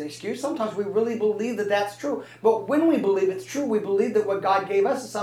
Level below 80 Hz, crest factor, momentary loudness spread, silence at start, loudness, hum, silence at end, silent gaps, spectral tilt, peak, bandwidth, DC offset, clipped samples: -78 dBFS; 16 dB; 8 LU; 0 s; -24 LUFS; none; 0 s; none; -5.5 dB/octave; -8 dBFS; 14 kHz; under 0.1%; under 0.1%